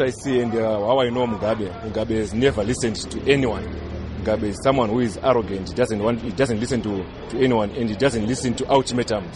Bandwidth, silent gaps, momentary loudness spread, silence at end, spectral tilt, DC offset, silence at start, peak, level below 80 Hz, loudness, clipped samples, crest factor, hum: 11.5 kHz; none; 8 LU; 0 s; -5.5 dB/octave; under 0.1%; 0 s; -4 dBFS; -40 dBFS; -22 LUFS; under 0.1%; 18 dB; none